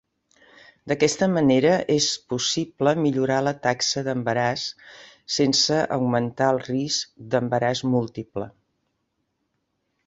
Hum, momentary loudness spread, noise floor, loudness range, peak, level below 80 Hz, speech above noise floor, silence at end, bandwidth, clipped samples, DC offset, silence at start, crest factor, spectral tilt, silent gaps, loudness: none; 11 LU; -75 dBFS; 4 LU; -6 dBFS; -60 dBFS; 52 dB; 1.6 s; 8.2 kHz; under 0.1%; under 0.1%; 0.85 s; 18 dB; -4 dB/octave; none; -22 LUFS